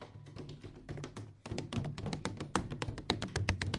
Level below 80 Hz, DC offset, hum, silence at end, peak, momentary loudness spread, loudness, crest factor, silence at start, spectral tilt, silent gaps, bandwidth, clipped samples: -52 dBFS; under 0.1%; none; 0 s; -12 dBFS; 14 LU; -40 LUFS; 28 dB; 0 s; -5 dB/octave; none; 11.5 kHz; under 0.1%